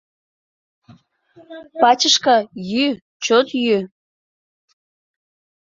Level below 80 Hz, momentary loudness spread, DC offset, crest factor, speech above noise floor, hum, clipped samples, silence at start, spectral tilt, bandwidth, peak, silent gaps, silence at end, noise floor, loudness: -66 dBFS; 12 LU; under 0.1%; 20 dB; 33 dB; none; under 0.1%; 1.5 s; -2.5 dB/octave; 7.8 kHz; -2 dBFS; 3.02-3.20 s; 1.75 s; -50 dBFS; -17 LUFS